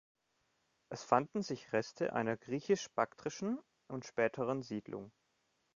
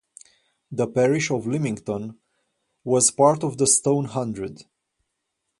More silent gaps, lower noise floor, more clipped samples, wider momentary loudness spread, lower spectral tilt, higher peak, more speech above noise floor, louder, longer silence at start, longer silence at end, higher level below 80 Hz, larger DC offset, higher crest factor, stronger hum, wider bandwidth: neither; about the same, -80 dBFS vs -78 dBFS; neither; about the same, 14 LU vs 16 LU; about the same, -5 dB/octave vs -4.5 dB/octave; second, -14 dBFS vs -4 dBFS; second, 43 dB vs 57 dB; second, -37 LUFS vs -21 LUFS; first, 0.9 s vs 0.7 s; second, 0.65 s vs 1 s; second, -76 dBFS vs -62 dBFS; neither; first, 26 dB vs 20 dB; neither; second, 7.4 kHz vs 11.5 kHz